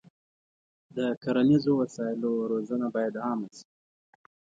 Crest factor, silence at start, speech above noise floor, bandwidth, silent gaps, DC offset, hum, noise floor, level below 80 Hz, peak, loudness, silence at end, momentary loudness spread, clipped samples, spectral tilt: 18 dB; 0.95 s; over 63 dB; 7.8 kHz; 1.17-1.21 s; under 0.1%; none; under -90 dBFS; -70 dBFS; -12 dBFS; -28 LUFS; 1 s; 10 LU; under 0.1%; -7.5 dB/octave